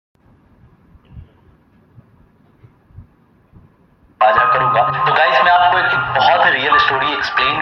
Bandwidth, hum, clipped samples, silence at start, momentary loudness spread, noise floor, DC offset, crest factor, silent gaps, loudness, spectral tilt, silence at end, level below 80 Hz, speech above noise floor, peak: 6.6 kHz; none; under 0.1%; 1.15 s; 4 LU; -52 dBFS; under 0.1%; 16 dB; none; -13 LUFS; -4.5 dB/octave; 0 s; -50 dBFS; 39 dB; 0 dBFS